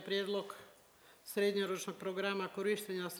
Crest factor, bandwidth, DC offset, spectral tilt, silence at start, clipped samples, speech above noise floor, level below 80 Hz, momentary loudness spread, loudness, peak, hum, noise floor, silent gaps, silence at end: 16 dB; over 20 kHz; under 0.1%; -4 dB/octave; 0 s; under 0.1%; 26 dB; -84 dBFS; 12 LU; -38 LUFS; -22 dBFS; none; -64 dBFS; none; 0 s